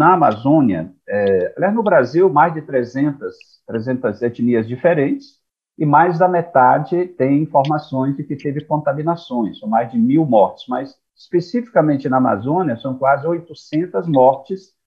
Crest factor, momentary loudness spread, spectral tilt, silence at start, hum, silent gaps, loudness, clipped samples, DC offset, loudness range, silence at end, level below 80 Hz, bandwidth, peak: 16 dB; 11 LU; -9 dB/octave; 0 s; none; none; -17 LUFS; under 0.1%; under 0.1%; 3 LU; 0.25 s; -62 dBFS; 7 kHz; -2 dBFS